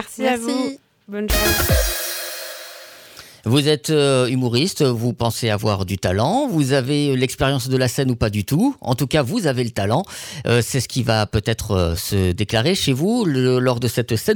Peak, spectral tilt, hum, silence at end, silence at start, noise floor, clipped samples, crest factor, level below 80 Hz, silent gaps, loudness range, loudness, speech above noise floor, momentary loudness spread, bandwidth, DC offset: -6 dBFS; -5 dB/octave; none; 0 s; 0 s; -42 dBFS; under 0.1%; 14 dB; -34 dBFS; none; 2 LU; -19 LUFS; 24 dB; 11 LU; over 20 kHz; under 0.1%